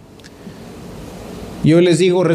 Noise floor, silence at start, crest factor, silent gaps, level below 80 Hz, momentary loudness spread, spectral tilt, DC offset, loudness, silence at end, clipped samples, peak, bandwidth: -37 dBFS; 0.45 s; 16 dB; none; -44 dBFS; 24 LU; -6.5 dB/octave; under 0.1%; -13 LUFS; 0 s; under 0.1%; -2 dBFS; 13.5 kHz